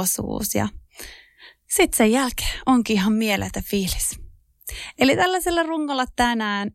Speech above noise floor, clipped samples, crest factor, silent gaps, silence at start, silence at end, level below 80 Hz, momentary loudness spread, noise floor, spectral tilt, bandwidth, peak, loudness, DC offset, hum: 29 dB; under 0.1%; 16 dB; none; 0 s; 0.05 s; -40 dBFS; 18 LU; -50 dBFS; -3.5 dB/octave; 16.5 kHz; -6 dBFS; -21 LUFS; under 0.1%; none